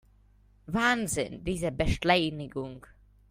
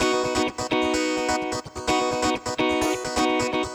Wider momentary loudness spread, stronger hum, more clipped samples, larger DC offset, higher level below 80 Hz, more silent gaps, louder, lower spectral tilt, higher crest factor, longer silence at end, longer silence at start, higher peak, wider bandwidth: first, 13 LU vs 3 LU; first, 50 Hz at -55 dBFS vs none; neither; neither; about the same, -44 dBFS vs -46 dBFS; neither; second, -29 LUFS vs -24 LUFS; about the same, -4.5 dB/octave vs -3.5 dB/octave; first, 24 dB vs 14 dB; first, 0.5 s vs 0 s; first, 0.7 s vs 0 s; about the same, -8 dBFS vs -10 dBFS; second, 16 kHz vs over 20 kHz